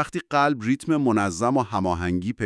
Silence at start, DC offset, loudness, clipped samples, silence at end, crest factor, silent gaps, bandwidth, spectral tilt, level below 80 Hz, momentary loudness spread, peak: 0 s; under 0.1%; -23 LUFS; under 0.1%; 0 s; 16 dB; none; 12 kHz; -6 dB/octave; -54 dBFS; 4 LU; -6 dBFS